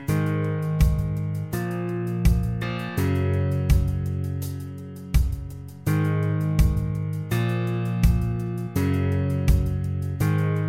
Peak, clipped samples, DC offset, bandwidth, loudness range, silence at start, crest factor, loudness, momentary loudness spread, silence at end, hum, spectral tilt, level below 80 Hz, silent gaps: -6 dBFS; under 0.1%; under 0.1%; 16.5 kHz; 2 LU; 0 s; 18 dB; -25 LUFS; 6 LU; 0 s; none; -7.5 dB/octave; -28 dBFS; none